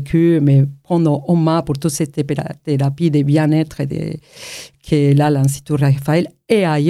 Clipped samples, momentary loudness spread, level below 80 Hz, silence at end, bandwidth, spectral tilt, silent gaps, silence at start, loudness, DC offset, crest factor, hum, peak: under 0.1%; 11 LU; -48 dBFS; 0 s; 13.5 kHz; -7 dB/octave; none; 0 s; -16 LUFS; under 0.1%; 14 dB; none; -2 dBFS